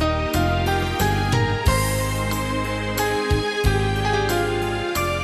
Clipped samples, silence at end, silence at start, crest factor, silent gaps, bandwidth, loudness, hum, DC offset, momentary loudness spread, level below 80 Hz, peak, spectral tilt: under 0.1%; 0 s; 0 s; 16 dB; none; 14 kHz; -22 LUFS; none; under 0.1%; 4 LU; -30 dBFS; -6 dBFS; -5 dB/octave